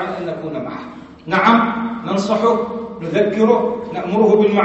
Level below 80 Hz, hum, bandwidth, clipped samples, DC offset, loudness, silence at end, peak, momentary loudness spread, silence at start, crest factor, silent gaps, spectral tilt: -54 dBFS; none; 8.2 kHz; under 0.1%; under 0.1%; -17 LUFS; 0 s; 0 dBFS; 14 LU; 0 s; 16 dB; none; -6.5 dB/octave